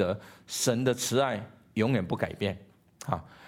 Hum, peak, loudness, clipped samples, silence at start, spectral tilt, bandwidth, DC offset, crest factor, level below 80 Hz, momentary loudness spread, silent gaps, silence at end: none; -12 dBFS; -30 LUFS; under 0.1%; 0 s; -4.5 dB/octave; 17 kHz; under 0.1%; 20 dB; -60 dBFS; 11 LU; none; 0 s